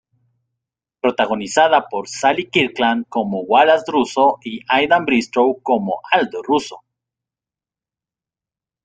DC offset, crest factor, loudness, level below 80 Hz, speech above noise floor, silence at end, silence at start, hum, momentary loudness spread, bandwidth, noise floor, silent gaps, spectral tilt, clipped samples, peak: under 0.1%; 18 dB; -17 LUFS; -60 dBFS; 72 dB; 2.05 s; 1.05 s; none; 7 LU; 9.4 kHz; -89 dBFS; none; -4 dB/octave; under 0.1%; 0 dBFS